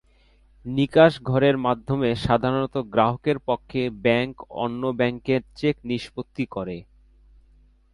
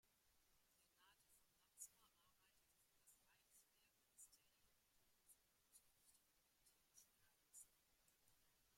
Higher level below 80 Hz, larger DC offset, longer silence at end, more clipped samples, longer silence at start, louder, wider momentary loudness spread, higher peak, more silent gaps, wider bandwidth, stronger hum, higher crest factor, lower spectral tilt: first, -50 dBFS vs under -90 dBFS; neither; first, 1.1 s vs 0 s; neither; first, 0.65 s vs 0.05 s; first, -23 LUFS vs -65 LUFS; first, 12 LU vs 6 LU; first, -4 dBFS vs -46 dBFS; neither; second, 11.5 kHz vs 16.5 kHz; neither; second, 20 dB vs 30 dB; first, -7.5 dB/octave vs 0 dB/octave